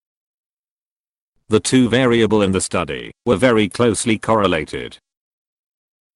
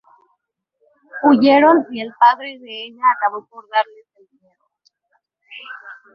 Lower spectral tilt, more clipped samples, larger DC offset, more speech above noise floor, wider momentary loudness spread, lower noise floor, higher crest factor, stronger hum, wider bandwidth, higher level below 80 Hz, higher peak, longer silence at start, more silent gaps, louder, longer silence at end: second, -5 dB/octave vs -7 dB/octave; neither; neither; first, over 74 dB vs 56 dB; second, 11 LU vs 24 LU; first, under -90 dBFS vs -72 dBFS; about the same, 16 dB vs 18 dB; neither; first, 12 kHz vs 5.8 kHz; first, -48 dBFS vs -68 dBFS; about the same, -2 dBFS vs -2 dBFS; first, 1.5 s vs 1.15 s; neither; about the same, -17 LUFS vs -16 LUFS; first, 1.2 s vs 0.2 s